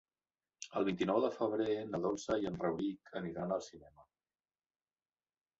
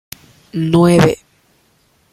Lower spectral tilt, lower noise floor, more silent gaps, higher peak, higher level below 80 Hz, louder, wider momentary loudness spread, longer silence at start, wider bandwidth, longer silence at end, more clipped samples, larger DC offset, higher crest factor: about the same, -5.5 dB/octave vs -6.5 dB/octave; first, under -90 dBFS vs -57 dBFS; neither; second, -20 dBFS vs 0 dBFS; second, -70 dBFS vs -44 dBFS; second, -37 LUFS vs -13 LUFS; second, 10 LU vs 25 LU; about the same, 0.6 s vs 0.55 s; second, 8 kHz vs 15.5 kHz; first, 1.55 s vs 0.95 s; neither; neither; about the same, 20 dB vs 16 dB